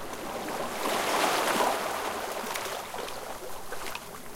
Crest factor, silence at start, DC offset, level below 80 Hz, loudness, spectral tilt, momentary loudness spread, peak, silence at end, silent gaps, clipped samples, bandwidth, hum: 20 dB; 0 s; under 0.1%; -56 dBFS; -31 LUFS; -2 dB/octave; 13 LU; -12 dBFS; 0 s; none; under 0.1%; 17 kHz; none